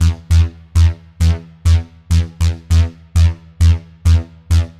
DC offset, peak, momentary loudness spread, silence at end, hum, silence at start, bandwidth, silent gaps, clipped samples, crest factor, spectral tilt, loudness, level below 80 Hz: under 0.1%; -2 dBFS; 3 LU; 0.1 s; none; 0 s; 11 kHz; none; under 0.1%; 12 dB; -6 dB/octave; -16 LUFS; -22 dBFS